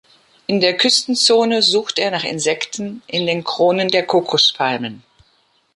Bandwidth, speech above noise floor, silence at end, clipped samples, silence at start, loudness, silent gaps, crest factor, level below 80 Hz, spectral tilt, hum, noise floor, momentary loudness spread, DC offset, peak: 11.5 kHz; 43 dB; 0.8 s; under 0.1%; 0.5 s; -16 LUFS; none; 16 dB; -64 dBFS; -3 dB/octave; none; -60 dBFS; 10 LU; under 0.1%; -2 dBFS